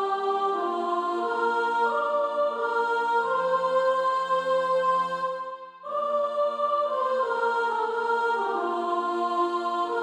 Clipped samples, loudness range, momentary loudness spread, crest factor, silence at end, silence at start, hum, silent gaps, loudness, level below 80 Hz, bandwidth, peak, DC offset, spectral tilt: under 0.1%; 2 LU; 4 LU; 12 dB; 0 s; 0 s; none; none; -26 LUFS; -78 dBFS; 11 kHz; -14 dBFS; under 0.1%; -4.5 dB/octave